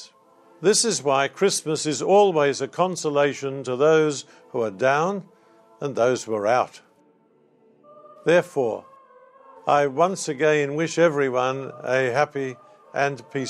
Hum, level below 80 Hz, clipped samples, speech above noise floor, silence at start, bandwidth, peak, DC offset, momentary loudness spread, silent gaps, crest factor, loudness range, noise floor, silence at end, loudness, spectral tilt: none; -76 dBFS; under 0.1%; 38 dB; 0 s; 15 kHz; -6 dBFS; under 0.1%; 12 LU; none; 18 dB; 5 LU; -60 dBFS; 0 s; -22 LUFS; -4 dB/octave